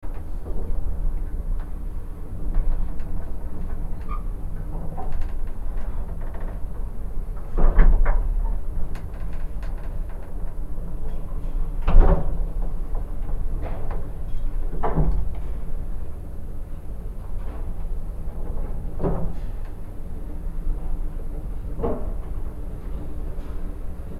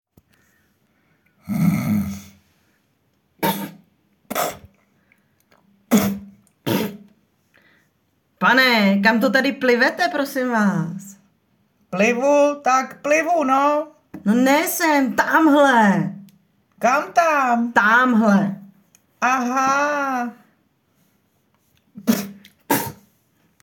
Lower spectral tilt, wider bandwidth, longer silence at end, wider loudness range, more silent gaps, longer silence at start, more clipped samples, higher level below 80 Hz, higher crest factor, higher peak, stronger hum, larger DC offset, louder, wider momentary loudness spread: first, -8.5 dB/octave vs -5 dB/octave; second, 2.9 kHz vs 17.5 kHz; second, 0 s vs 0.7 s; second, 6 LU vs 10 LU; neither; second, 0 s vs 1.45 s; neither; first, -24 dBFS vs -62 dBFS; about the same, 20 dB vs 18 dB; about the same, 0 dBFS vs -2 dBFS; neither; neither; second, -31 LUFS vs -18 LUFS; second, 11 LU vs 14 LU